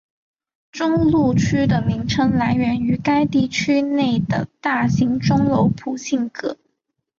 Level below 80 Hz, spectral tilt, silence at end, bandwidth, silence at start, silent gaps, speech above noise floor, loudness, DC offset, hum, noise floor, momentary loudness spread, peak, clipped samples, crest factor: -44 dBFS; -6.5 dB/octave; 0.65 s; 7.6 kHz; 0.75 s; none; 56 dB; -19 LUFS; under 0.1%; none; -74 dBFS; 8 LU; -6 dBFS; under 0.1%; 12 dB